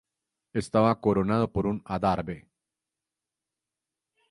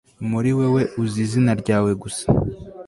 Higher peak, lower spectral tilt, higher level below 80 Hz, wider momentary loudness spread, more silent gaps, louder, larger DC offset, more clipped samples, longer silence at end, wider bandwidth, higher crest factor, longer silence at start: second, -8 dBFS vs -4 dBFS; about the same, -7.5 dB/octave vs -7 dB/octave; second, -52 dBFS vs -42 dBFS; first, 11 LU vs 6 LU; neither; second, -27 LUFS vs -21 LUFS; neither; neither; first, 1.9 s vs 0 s; about the same, 11.5 kHz vs 11.5 kHz; about the same, 20 dB vs 16 dB; first, 0.55 s vs 0.2 s